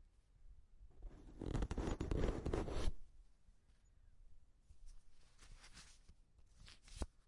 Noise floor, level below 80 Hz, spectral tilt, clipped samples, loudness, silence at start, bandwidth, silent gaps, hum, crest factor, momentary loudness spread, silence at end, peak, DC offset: -68 dBFS; -50 dBFS; -6.5 dB/octave; under 0.1%; -45 LUFS; 0 s; 11.5 kHz; none; none; 22 dB; 25 LU; 0.2 s; -24 dBFS; under 0.1%